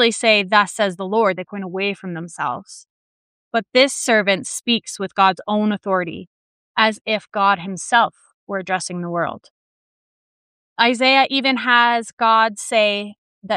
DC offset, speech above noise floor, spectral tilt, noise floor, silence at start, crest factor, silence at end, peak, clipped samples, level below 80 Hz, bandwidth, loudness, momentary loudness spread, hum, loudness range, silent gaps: under 0.1%; over 71 dB; -3 dB/octave; under -90 dBFS; 0 s; 18 dB; 0 s; -2 dBFS; under 0.1%; -70 dBFS; 15 kHz; -18 LUFS; 12 LU; none; 5 LU; 2.90-3.51 s, 6.27-6.75 s, 7.01-7.05 s, 8.34-8.47 s, 9.51-10.76 s, 12.13-12.17 s, 13.18-13.42 s